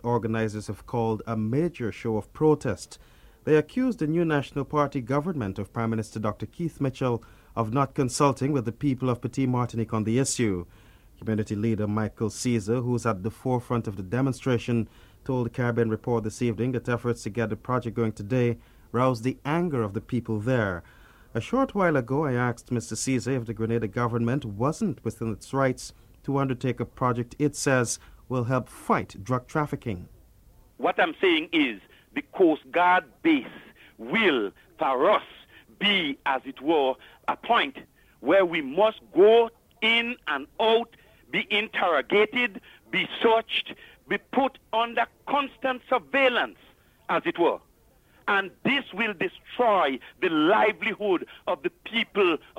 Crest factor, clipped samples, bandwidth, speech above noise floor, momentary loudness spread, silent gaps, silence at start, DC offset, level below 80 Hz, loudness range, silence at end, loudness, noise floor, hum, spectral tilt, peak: 18 dB; under 0.1%; 16 kHz; 34 dB; 10 LU; none; 0.05 s; under 0.1%; -54 dBFS; 5 LU; 0.2 s; -26 LUFS; -60 dBFS; none; -5.5 dB/octave; -8 dBFS